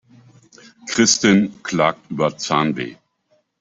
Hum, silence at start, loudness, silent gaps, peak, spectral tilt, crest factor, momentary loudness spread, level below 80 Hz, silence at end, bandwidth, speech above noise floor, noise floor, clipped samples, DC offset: none; 0.85 s; -18 LUFS; none; -2 dBFS; -3.5 dB/octave; 18 dB; 13 LU; -58 dBFS; 0.7 s; 8.2 kHz; 46 dB; -64 dBFS; under 0.1%; under 0.1%